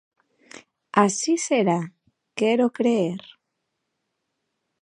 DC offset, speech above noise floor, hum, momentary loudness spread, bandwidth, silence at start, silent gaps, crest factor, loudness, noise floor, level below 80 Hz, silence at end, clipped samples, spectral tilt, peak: under 0.1%; 57 dB; none; 13 LU; 11 kHz; 0.95 s; none; 24 dB; -22 LUFS; -78 dBFS; -76 dBFS; 1.65 s; under 0.1%; -4.5 dB/octave; -2 dBFS